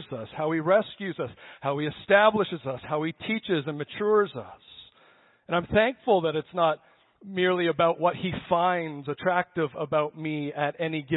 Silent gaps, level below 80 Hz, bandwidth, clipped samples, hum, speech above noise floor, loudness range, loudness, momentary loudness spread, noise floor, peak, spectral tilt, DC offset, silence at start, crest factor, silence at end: none; -60 dBFS; 4.1 kHz; under 0.1%; none; 33 dB; 2 LU; -26 LUFS; 11 LU; -60 dBFS; -6 dBFS; -10 dB/octave; under 0.1%; 0 s; 20 dB; 0 s